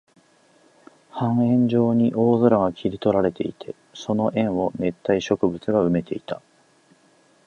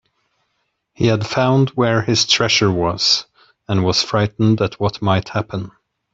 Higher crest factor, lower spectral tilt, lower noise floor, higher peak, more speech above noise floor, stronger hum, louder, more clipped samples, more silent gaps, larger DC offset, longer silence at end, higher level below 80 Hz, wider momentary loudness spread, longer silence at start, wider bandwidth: about the same, 20 dB vs 16 dB; first, -8 dB/octave vs -4.5 dB/octave; second, -58 dBFS vs -70 dBFS; about the same, -4 dBFS vs -2 dBFS; second, 37 dB vs 54 dB; neither; second, -22 LUFS vs -17 LUFS; neither; neither; neither; first, 1.1 s vs 0.45 s; second, -54 dBFS vs -48 dBFS; first, 14 LU vs 9 LU; first, 1.15 s vs 1 s; second, 7 kHz vs 7.8 kHz